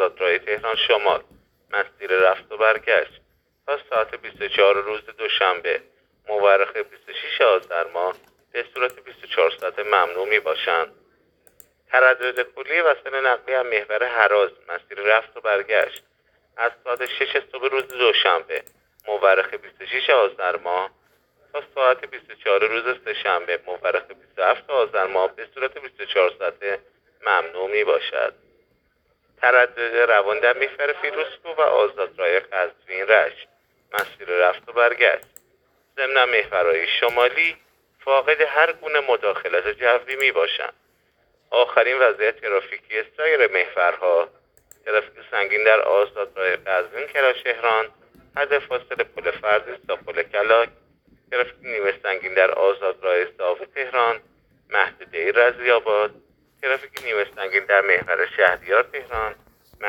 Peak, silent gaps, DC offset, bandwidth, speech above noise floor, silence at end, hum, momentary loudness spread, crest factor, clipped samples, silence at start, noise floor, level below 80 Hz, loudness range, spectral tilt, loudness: 0 dBFS; none; under 0.1%; 17.5 kHz; 45 dB; 0 s; none; 11 LU; 22 dB; under 0.1%; 0 s; -66 dBFS; -62 dBFS; 3 LU; -2.5 dB/octave; -21 LUFS